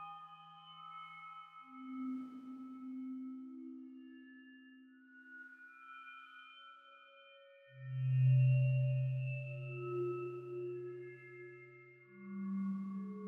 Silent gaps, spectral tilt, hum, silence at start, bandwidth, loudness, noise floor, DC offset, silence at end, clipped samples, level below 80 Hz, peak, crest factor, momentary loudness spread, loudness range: none; -10.5 dB/octave; none; 0 s; 3.3 kHz; -39 LUFS; -62 dBFS; under 0.1%; 0 s; under 0.1%; -84 dBFS; -24 dBFS; 16 dB; 25 LU; 19 LU